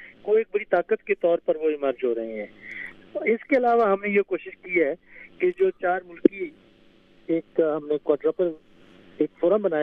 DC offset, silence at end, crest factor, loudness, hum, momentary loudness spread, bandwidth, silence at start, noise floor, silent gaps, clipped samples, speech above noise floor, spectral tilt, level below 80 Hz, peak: under 0.1%; 0 s; 24 dB; -24 LUFS; none; 14 LU; 4.9 kHz; 0 s; -55 dBFS; none; under 0.1%; 32 dB; -8.5 dB/octave; -66 dBFS; 0 dBFS